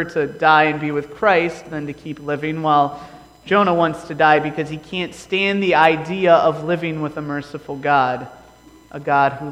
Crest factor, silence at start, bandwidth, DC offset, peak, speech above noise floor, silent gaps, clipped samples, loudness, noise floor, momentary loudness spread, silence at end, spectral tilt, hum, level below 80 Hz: 18 dB; 0 s; 16 kHz; under 0.1%; 0 dBFS; 28 dB; none; under 0.1%; -18 LUFS; -46 dBFS; 15 LU; 0 s; -6 dB/octave; none; -54 dBFS